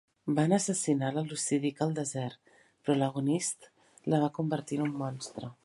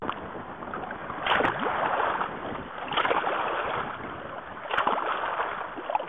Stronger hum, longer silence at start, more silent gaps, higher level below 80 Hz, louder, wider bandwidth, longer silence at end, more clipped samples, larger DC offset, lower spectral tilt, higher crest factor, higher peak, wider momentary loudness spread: neither; first, 0.25 s vs 0 s; neither; second, -74 dBFS vs -56 dBFS; about the same, -31 LUFS vs -29 LUFS; first, 11.5 kHz vs 9.4 kHz; about the same, 0.1 s vs 0 s; neither; second, under 0.1% vs 0.2%; about the same, -5.5 dB/octave vs -6 dB/octave; about the same, 20 dB vs 16 dB; about the same, -12 dBFS vs -14 dBFS; about the same, 11 LU vs 12 LU